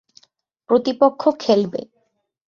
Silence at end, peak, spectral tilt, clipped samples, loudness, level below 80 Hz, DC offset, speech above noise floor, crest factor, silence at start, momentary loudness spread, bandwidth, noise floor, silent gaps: 0.7 s; -2 dBFS; -6.5 dB/octave; under 0.1%; -18 LUFS; -66 dBFS; under 0.1%; 51 dB; 18 dB; 0.7 s; 9 LU; 7.2 kHz; -69 dBFS; none